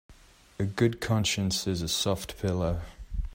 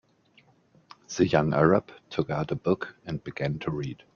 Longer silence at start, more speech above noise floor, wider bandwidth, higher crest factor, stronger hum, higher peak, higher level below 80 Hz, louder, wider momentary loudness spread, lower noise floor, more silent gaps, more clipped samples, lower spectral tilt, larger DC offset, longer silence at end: second, 0.1 s vs 1.1 s; second, 21 dB vs 35 dB; first, 16 kHz vs 7.2 kHz; about the same, 18 dB vs 22 dB; neither; second, -12 dBFS vs -6 dBFS; first, -42 dBFS vs -56 dBFS; about the same, -29 LUFS vs -27 LUFS; second, 9 LU vs 13 LU; second, -50 dBFS vs -62 dBFS; neither; neither; second, -4.5 dB/octave vs -6.5 dB/octave; neither; second, 0 s vs 0.2 s